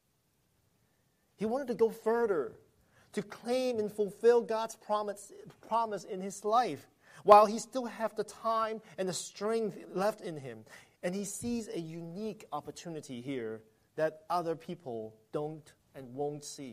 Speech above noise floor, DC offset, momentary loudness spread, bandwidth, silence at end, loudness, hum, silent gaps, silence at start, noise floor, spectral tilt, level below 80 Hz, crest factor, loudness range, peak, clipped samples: 42 dB; under 0.1%; 14 LU; 15 kHz; 0 s; -33 LUFS; none; none; 1.4 s; -75 dBFS; -5 dB/octave; -72 dBFS; 28 dB; 9 LU; -6 dBFS; under 0.1%